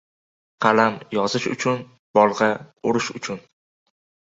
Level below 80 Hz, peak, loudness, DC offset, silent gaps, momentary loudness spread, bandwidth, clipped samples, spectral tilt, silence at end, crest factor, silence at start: -64 dBFS; -2 dBFS; -21 LUFS; under 0.1%; 1.99-2.14 s; 11 LU; 8 kHz; under 0.1%; -4.5 dB/octave; 0.95 s; 22 dB; 0.6 s